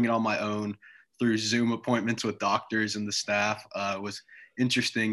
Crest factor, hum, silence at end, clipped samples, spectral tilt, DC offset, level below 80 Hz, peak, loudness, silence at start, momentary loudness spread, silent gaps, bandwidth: 16 dB; none; 0 s; under 0.1%; -4 dB/octave; under 0.1%; -68 dBFS; -12 dBFS; -28 LUFS; 0 s; 10 LU; none; 12.5 kHz